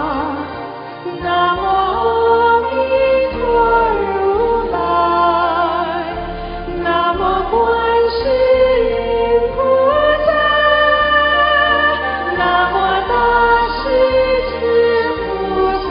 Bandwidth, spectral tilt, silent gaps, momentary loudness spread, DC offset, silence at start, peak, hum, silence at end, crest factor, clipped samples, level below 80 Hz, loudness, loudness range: 5.4 kHz; -2 dB/octave; none; 9 LU; under 0.1%; 0 s; -2 dBFS; none; 0 s; 12 dB; under 0.1%; -34 dBFS; -14 LUFS; 3 LU